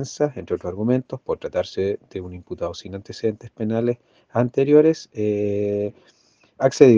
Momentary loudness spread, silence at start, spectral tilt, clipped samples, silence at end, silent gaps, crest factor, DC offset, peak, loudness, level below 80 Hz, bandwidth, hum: 15 LU; 0 s; -7 dB/octave; under 0.1%; 0 s; none; 22 dB; under 0.1%; 0 dBFS; -23 LUFS; -58 dBFS; 7.6 kHz; none